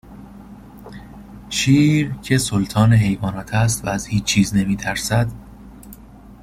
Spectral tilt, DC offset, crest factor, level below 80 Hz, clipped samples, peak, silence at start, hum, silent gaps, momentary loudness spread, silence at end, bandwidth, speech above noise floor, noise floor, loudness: -5 dB/octave; under 0.1%; 16 dB; -40 dBFS; under 0.1%; -4 dBFS; 0.1 s; none; none; 25 LU; 0.1 s; 15.5 kHz; 24 dB; -41 dBFS; -18 LUFS